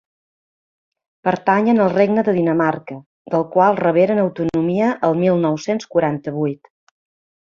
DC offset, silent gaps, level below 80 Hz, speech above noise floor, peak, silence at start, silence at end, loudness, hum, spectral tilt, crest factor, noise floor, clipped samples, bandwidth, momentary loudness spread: under 0.1%; 3.06-3.25 s; -58 dBFS; over 73 dB; -2 dBFS; 1.25 s; 0.9 s; -18 LUFS; none; -7.5 dB/octave; 16 dB; under -90 dBFS; under 0.1%; 7.4 kHz; 9 LU